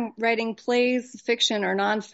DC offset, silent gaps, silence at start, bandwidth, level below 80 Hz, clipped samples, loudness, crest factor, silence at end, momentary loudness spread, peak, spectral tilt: under 0.1%; none; 0 s; 8 kHz; -76 dBFS; under 0.1%; -24 LUFS; 16 dB; 0.05 s; 5 LU; -10 dBFS; -1.5 dB/octave